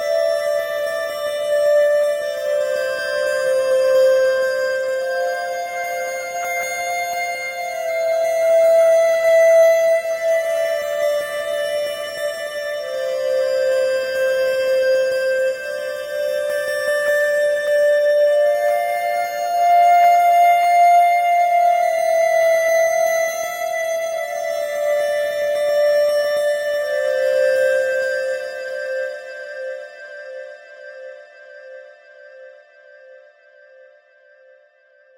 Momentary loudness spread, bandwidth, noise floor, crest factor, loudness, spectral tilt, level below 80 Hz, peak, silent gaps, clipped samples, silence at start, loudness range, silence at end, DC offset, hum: 12 LU; 16 kHz; -54 dBFS; 12 dB; -18 LUFS; -0.5 dB/octave; -64 dBFS; -6 dBFS; none; under 0.1%; 0 s; 8 LU; 2 s; under 0.1%; none